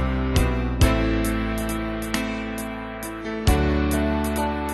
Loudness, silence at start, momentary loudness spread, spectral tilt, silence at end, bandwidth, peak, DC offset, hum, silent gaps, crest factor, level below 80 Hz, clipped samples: -24 LUFS; 0 s; 10 LU; -5.5 dB/octave; 0 s; 12.5 kHz; -4 dBFS; under 0.1%; none; none; 18 dB; -28 dBFS; under 0.1%